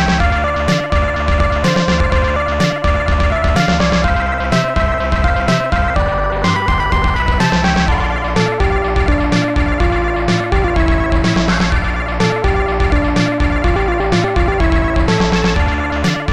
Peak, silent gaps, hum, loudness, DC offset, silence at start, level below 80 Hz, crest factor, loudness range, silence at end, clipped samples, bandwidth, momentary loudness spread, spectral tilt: -2 dBFS; none; none; -15 LUFS; 1%; 0 s; -18 dBFS; 12 dB; 1 LU; 0 s; under 0.1%; 10.5 kHz; 2 LU; -6 dB/octave